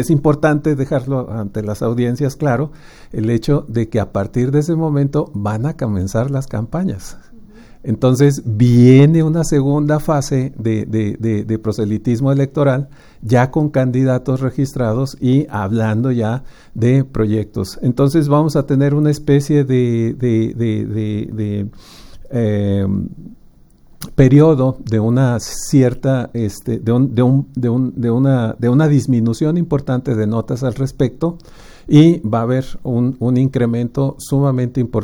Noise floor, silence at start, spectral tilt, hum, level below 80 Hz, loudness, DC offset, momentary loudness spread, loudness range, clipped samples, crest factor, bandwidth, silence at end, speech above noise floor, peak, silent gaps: -45 dBFS; 0 s; -8 dB/octave; none; -38 dBFS; -16 LUFS; under 0.1%; 9 LU; 5 LU; under 0.1%; 16 dB; 16.5 kHz; 0 s; 30 dB; 0 dBFS; none